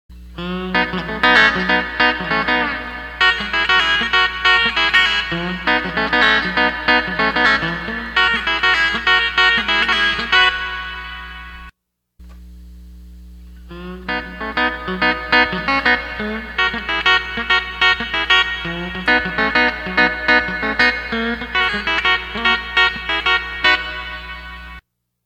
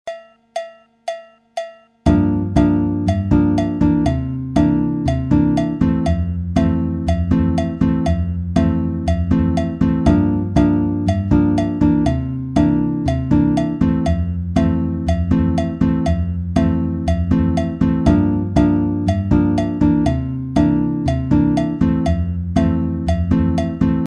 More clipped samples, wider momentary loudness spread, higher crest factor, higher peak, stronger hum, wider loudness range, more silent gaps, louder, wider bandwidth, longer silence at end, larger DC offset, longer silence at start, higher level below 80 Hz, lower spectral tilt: neither; first, 12 LU vs 5 LU; about the same, 18 dB vs 14 dB; about the same, 0 dBFS vs -2 dBFS; second, none vs 50 Hz at -45 dBFS; first, 7 LU vs 2 LU; neither; about the same, -15 LUFS vs -17 LUFS; first, 15 kHz vs 9.8 kHz; first, 0.45 s vs 0 s; neither; about the same, 0.1 s vs 0.05 s; second, -38 dBFS vs -28 dBFS; second, -3.5 dB/octave vs -8.5 dB/octave